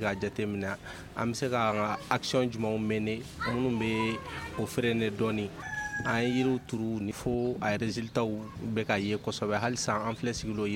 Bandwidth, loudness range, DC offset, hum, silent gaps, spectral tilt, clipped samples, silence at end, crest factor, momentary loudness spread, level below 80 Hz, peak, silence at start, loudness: 16.5 kHz; 1 LU; under 0.1%; none; none; -5 dB/octave; under 0.1%; 0 s; 22 dB; 6 LU; -54 dBFS; -10 dBFS; 0 s; -31 LUFS